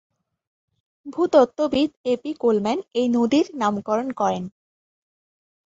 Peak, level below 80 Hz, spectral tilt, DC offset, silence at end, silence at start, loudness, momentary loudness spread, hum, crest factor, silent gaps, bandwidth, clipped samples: -4 dBFS; -62 dBFS; -6 dB/octave; under 0.1%; 1.2 s; 1.05 s; -22 LUFS; 8 LU; none; 20 dB; 1.97-2.04 s; 7.8 kHz; under 0.1%